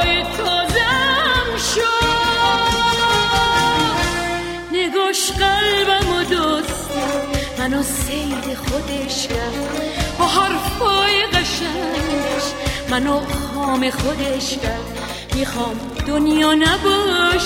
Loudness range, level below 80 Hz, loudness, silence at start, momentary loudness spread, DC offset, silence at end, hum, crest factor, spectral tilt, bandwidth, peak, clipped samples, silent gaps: 5 LU; -32 dBFS; -18 LUFS; 0 s; 8 LU; under 0.1%; 0 s; none; 16 dB; -3.5 dB/octave; 16.5 kHz; -2 dBFS; under 0.1%; none